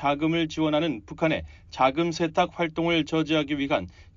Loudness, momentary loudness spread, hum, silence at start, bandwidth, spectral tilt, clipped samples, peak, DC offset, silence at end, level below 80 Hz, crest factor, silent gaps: -25 LUFS; 4 LU; none; 0 s; 7.4 kHz; -4 dB/octave; under 0.1%; -8 dBFS; under 0.1%; 0.15 s; -52 dBFS; 16 dB; none